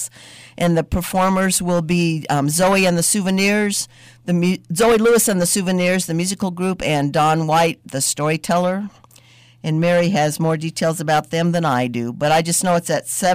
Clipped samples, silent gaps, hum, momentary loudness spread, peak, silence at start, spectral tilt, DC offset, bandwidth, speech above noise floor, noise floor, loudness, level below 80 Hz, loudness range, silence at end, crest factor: under 0.1%; none; none; 7 LU; -8 dBFS; 0 s; -4.5 dB/octave; under 0.1%; 16 kHz; 31 dB; -48 dBFS; -18 LUFS; -46 dBFS; 3 LU; 0 s; 10 dB